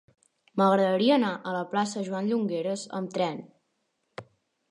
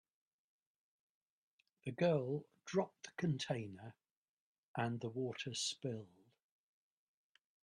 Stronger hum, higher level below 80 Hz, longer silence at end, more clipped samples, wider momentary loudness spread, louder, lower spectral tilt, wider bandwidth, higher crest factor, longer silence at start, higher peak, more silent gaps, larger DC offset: neither; about the same, -78 dBFS vs -80 dBFS; second, 0.5 s vs 1.55 s; neither; first, 21 LU vs 14 LU; first, -27 LUFS vs -41 LUFS; about the same, -5.5 dB/octave vs -5 dB/octave; second, 11 kHz vs 12.5 kHz; about the same, 18 dB vs 20 dB; second, 0.55 s vs 1.85 s; first, -10 dBFS vs -24 dBFS; second, none vs 4.11-4.74 s; neither